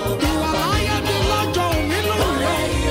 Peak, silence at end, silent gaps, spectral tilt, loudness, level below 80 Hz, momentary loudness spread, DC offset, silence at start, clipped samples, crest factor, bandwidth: -8 dBFS; 0 s; none; -4.5 dB/octave; -19 LUFS; -28 dBFS; 1 LU; under 0.1%; 0 s; under 0.1%; 12 dB; 16.5 kHz